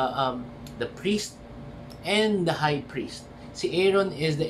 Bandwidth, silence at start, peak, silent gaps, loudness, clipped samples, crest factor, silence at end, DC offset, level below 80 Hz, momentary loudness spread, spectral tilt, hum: 14 kHz; 0 s; -10 dBFS; none; -27 LUFS; under 0.1%; 16 dB; 0 s; under 0.1%; -52 dBFS; 18 LU; -5 dB/octave; none